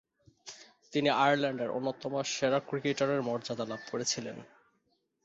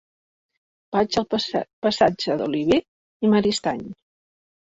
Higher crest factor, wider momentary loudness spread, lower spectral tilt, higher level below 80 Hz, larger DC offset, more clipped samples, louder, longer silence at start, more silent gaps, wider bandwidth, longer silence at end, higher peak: about the same, 20 dB vs 18 dB; first, 22 LU vs 7 LU; about the same, -4 dB/octave vs -5 dB/octave; second, -74 dBFS vs -56 dBFS; neither; neither; second, -31 LUFS vs -22 LUFS; second, 0.45 s vs 0.9 s; second, none vs 1.73-1.82 s, 2.88-3.20 s; about the same, 8.2 kHz vs 8 kHz; about the same, 0.8 s vs 0.75 s; second, -14 dBFS vs -4 dBFS